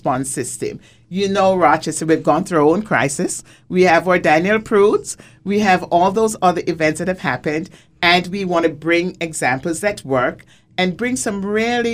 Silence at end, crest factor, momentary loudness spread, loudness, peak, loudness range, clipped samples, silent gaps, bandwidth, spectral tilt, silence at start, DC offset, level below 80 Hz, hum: 0 s; 16 dB; 9 LU; -17 LUFS; 0 dBFS; 3 LU; under 0.1%; none; 16 kHz; -4.5 dB/octave; 0.05 s; under 0.1%; -50 dBFS; none